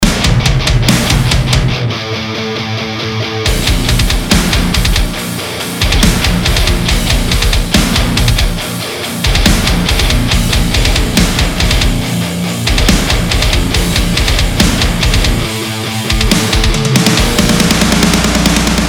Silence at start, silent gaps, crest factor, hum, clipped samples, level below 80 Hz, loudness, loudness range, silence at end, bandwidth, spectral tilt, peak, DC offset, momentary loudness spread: 0 s; none; 10 dB; none; 0.3%; -16 dBFS; -12 LUFS; 2 LU; 0 s; over 20 kHz; -4 dB/octave; 0 dBFS; under 0.1%; 7 LU